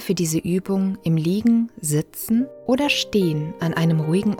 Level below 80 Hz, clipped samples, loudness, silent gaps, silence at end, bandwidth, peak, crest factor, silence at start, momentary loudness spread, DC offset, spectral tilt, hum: -56 dBFS; under 0.1%; -21 LUFS; none; 0 s; 18.5 kHz; -6 dBFS; 14 dB; 0 s; 4 LU; under 0.1%; -5.5 dB/octave; none